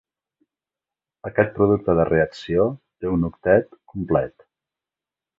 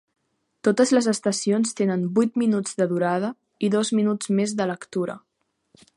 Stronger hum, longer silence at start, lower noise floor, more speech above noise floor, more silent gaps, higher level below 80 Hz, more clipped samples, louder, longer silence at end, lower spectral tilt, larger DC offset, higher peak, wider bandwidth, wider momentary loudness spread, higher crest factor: neither; first, 1.25 s vs 0.65 s; first, -89 dBFS vs -64 dBFS; first, 69 dB vs 42 dB; neither; first, -46 dBFS vs -72 dBFS; neither; about the same, -21 LUFS vs -23 LUFS; first, 1.1 s vs 0.8 s; first, -9 dB/octave vs -5 dB/octave; neither; about the same, -4 dBFS vs -6 dBFS; second, 7.6 kHz vs 11.5 kHz; first, 14 LU vs 9 LU; about the same, 20 dB vs 18 dB